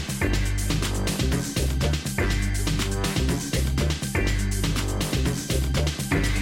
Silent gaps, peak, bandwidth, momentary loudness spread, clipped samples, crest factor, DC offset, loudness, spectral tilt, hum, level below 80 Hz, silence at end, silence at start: none; -10 dBFS; 17 kHz; 1 LU; under 0.1%; 14 dB; under 0.1%; -25 LUFS; -4.5 dB/octave; none; -28 dBFS; 0 s; 0 s